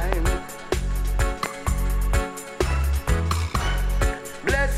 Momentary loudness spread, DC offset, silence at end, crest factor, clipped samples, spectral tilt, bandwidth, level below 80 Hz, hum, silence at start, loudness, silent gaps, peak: 4 LU; under 0.1%; 0 s; 16 dB; under 0.1%; -5 dB/octave; 15.5 kHz; -24 dBFS; none; 0 s; -26 LUFS; none; -6 dBFS